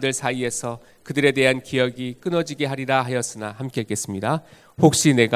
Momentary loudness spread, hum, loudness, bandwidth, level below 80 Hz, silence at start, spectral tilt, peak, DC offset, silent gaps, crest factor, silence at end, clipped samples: 12 LU; none; -22 LUFS; 16 kHz; -58 dBFS; 0 s; -4.5 dB/octave; 0 dBFS; under 0.1%; none; 22 dB; 0 s; under 0.1%